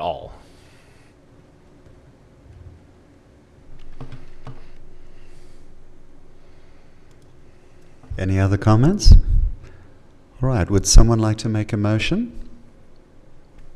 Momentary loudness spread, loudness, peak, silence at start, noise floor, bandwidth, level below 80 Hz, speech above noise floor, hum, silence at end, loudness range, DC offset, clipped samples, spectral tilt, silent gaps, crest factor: 27 LU; -19 LUFS; 0 dBFS; 0 s; -50 dBFS; 12.5 kHz; -22 dBFS; 36 dB; none; 0 s; 9 LU; under 0.1%; under 0.1%; -5.5 dB/octave; none; 20 dB